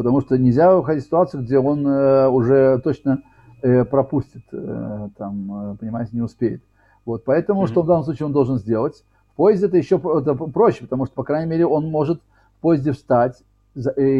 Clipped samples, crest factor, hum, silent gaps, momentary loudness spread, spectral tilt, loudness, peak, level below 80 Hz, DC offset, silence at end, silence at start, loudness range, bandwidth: under 0.1%; 14 dB; none; none; 14 LU; -10 dB/octave; -19 LUFS; -4 dBFS; -50 dBFS; under 0.1%; 0 s; 0 s; 6 LU; 7.6 kHz